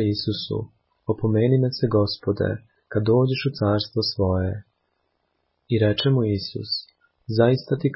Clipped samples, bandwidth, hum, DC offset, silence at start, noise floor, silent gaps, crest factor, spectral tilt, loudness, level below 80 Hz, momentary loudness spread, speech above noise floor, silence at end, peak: under 0.1%; 5.8 kHz; none; under 0.1%; 0 s; -72 dBFS; none; 16 dB; -10.5 dB/octave; -23 LUFS; -44 dBFS; 10 LU; 51 dB; 0 s; -6 dBFS